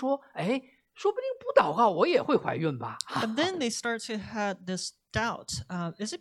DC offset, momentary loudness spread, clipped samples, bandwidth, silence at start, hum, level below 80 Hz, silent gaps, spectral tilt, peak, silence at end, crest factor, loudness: under 0.1%; 11 LU; under 0.1%; 13 kHz; 0 s; none; -60 dBFS; none; -4.5 dB/octave; -6 dBFS; 0.05 s; 22 dB; -29 LUFS